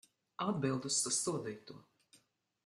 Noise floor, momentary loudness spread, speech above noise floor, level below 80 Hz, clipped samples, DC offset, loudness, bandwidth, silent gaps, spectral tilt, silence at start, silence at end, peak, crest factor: -72 dBFS; 20 LU; 34 dB; -78 dBFS; under 0.1%; under 0.1%; -36 LUFS; 12.5 kHz; none; -3.5 dB/octave; 0.4 s; 0.5 s; -22 dBFS; 18 dB